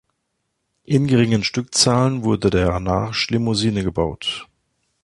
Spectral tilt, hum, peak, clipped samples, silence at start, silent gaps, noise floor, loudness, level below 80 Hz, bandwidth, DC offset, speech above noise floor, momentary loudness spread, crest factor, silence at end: -5 dB/octave; none; -2 dBFS; under 0.1%; 0.9 s; none; -74 dBFS; -19 LUFS; -38 dBFS; 11.5 kHz; under 0.1%; 55 dB; 7 LU; 18 dB; 0.6 s